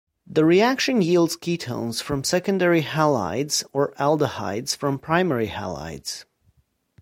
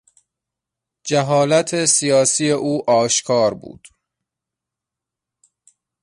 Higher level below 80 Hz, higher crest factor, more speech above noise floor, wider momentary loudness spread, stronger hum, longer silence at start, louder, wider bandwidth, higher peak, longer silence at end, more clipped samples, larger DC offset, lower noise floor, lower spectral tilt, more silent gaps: first, -54 dBFS vs -62 dBFS; about the same, 18 dB vs 16 dB; second, 42 dB vs 68 dB; first, 12 LU vs 7 LU; neither; second, 0.3 s vs 1.05 s; second, -22 LUFS vs -16 LUFS; first, 16.5 kHz vs 11.5 kHz; about the same, -4 dBFS vs -4 dBFS; second, 0.8 s vs 2.3 s; neither; neither; second, -64 dBFS vs -85 dBFS; about the same, -4.5 dB/octave vs -3.5 dB/octave; neither